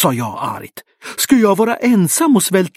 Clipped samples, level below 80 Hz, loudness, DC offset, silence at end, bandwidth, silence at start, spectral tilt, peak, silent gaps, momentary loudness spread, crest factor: under 0.1%; -58 dBFS; -14 LUFS; under 0.1%; 0.1 s; 16 kHz; 0 s; -4.5 dB/octave; 0 dBFS; none; 17 LU; 14 dB